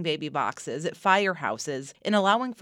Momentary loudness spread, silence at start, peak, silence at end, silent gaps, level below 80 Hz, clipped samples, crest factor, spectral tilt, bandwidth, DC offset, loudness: 10 LU; 0 s; -6 dBFS; 0.1 s; none; -78 dBFS; under 0.1%; 20 dB; -4 dB/octave; 15.5 kHz; under 0.1%; -26 LUFS